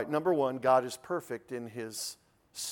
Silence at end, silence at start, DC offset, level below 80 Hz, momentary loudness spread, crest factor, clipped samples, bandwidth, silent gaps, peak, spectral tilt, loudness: 0 s; 0 s; under 0.1%; -76 dBFS; 13 LU; 18 dB; under 0.1%; 18 kHz; none; -14 dBFS; -4 dB/octave; -32 LUFS